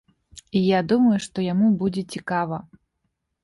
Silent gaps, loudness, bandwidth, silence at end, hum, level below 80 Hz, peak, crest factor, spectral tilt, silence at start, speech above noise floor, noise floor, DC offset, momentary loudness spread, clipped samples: none; -22 LUFS; 11.5 kHz; 0.85 s; none; -58 dBFS; -8 dBFS; 14 dB; -6.5 dB/octave; 0.55 s; 55 dB; -76 dBFS; under 0.1%; 10 LU; under 0.1%